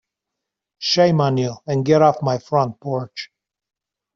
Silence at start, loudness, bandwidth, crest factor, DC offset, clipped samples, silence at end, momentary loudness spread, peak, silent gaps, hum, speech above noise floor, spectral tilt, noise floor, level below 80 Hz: 0.8 s; -19 LUFS; 7.4 kHz; 18 dB; under 0.1%; under 0.1%; 0.9 s; 13 LU; -2 dBFS; none; none; 64 dB; -6 dB/octave; -83 dBFS; -60 dBFS